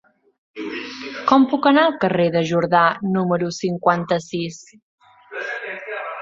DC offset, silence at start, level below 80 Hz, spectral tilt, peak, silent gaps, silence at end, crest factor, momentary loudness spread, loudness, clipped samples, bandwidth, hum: under 0.1%; 0.55 s; -62 dBFS; -6 dB/octave; -2 dBFS; 4.82-4.98 s; 0 s; 20 dB; 15 LU; -19 LUFS; under 0.1%; 7.8 kHz; none